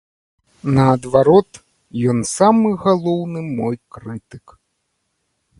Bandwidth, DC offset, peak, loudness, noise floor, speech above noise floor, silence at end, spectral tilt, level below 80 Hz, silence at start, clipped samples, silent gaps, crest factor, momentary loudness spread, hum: 11.5 kHz; under 0.1%; 0 dBFS; -16 LUFS; -71 dBFS; 55 dB; 1.2 s; -7 dB/octave; -50 dBFS; 0.65 s; under 0.1%; none; 18 dB; 19 LU; none